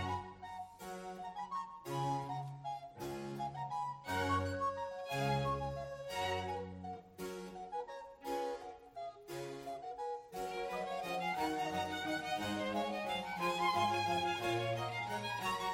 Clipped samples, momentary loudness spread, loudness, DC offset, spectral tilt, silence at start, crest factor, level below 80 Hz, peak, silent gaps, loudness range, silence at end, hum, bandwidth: under 0.1%; 12 LU; -40 LUFS; under 0.1%; -5 dB/octave; 0 s; 18 dB; -64 dBFS; -22 dBFS; none; 8 LU; 0 s; none; 16.5 kHz